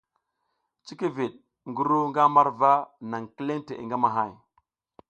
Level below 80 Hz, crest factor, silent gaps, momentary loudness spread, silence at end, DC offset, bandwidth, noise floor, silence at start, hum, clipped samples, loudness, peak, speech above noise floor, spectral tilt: -72 dBFS; 22 dB; none; 15 LU; 0.75 s; under 0.1%; 8.4 kHz; -78 dBFS; 0.85 s; none; under 0.1%; -25 LUFS; -6 dBFS; 53 dB; -7 dB/octave